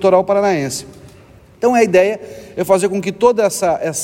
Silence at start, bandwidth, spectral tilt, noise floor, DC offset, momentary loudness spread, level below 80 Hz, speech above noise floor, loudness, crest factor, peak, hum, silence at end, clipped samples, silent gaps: 0 s; 16.5 kHz; -4.5 dB/octave; -43 dBFS; under 0.1%; 12 LU; -52 dBFS; 29 dB; -15 LUFS; 14 dB; -2 dBFS; none; 0 s; under 0.1%; none